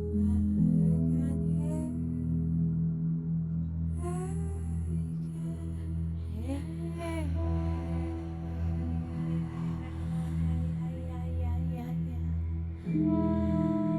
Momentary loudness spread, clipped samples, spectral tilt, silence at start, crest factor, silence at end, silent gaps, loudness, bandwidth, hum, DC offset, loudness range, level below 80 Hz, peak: 8 LU; under 0.1%; -9.5 dB/octave; 0 s; 14 dB; 0 s; none; -32 LUFS; 11.5 kHz; none; under 0.1%; 5 LU; -44 dBFS; -16 dBFS